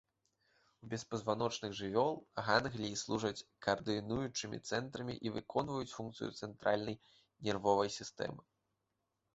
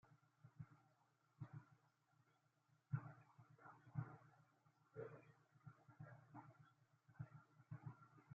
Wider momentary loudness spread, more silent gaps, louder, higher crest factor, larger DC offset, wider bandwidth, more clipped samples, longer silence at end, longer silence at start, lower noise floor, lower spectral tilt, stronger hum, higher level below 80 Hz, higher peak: second, 11 LU vs 16 LU; neither; first, -38 LUFS vs -59 LUFS; about the same, 24 dB vs 26 dB; neither; first, 8 kHz vs 6.4 kHz; neither; first, 0.95 s vs 0 s; first, 0.85 s vs 0.05 s; first, -86 dBFS vs -82 dBFS; second, -4 dB/octave vs -9 dB/octave; neither; first, -68 dBFS vs -90 dBFS; first, -14 dBFS vs -34 dBFS